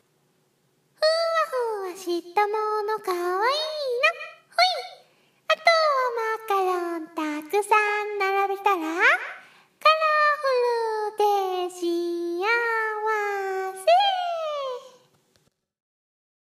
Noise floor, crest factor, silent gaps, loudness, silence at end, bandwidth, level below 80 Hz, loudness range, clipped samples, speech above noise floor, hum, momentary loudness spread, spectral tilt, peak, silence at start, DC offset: -68 dBFS; 20 dB; none; -23 LUFS; 1.65 s; 15.5 kHz; -86 dBFS; 4 LU; under 0.1%; 43 dB; none; 10 LU; -1 dB/octave; -4 dBFS; 1 s; under 0.1%